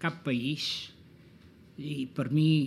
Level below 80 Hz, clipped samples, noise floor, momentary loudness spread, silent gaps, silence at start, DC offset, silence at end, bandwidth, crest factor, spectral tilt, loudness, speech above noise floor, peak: -68 dBFS; under 0.1%; -55 dBFS; 17 LU; none; 0 s; under 0.1%; 0 s; 12.5 kHz; 16 dB; -6 dB/octave; -31 LUFS; 26 dB; -14 dBFS